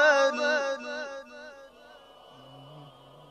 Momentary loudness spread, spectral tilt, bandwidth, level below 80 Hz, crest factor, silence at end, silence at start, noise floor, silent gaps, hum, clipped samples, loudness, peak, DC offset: 27 LU; -2.5 dB/octave; 9.6 kHz; -74 dBFS; 20 dB; 0.4 s; 0 s; -53 dBFS; none; none; under 0.1%; -27 LUFS; -10 dBFS; under 0.1%